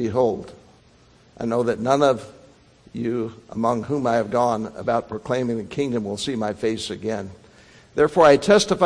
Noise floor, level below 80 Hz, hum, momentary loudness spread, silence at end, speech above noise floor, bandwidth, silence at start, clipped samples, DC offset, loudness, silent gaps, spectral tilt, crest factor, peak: -54 dBFS; -54 dBFS; none; 15 LU; 0 s; 33 dB; 10.5 kHz; 0 s; under 0.1%; under 0.1%; -22 LUFS; none; -5 dB/octave; 20 dB; -2 dBFS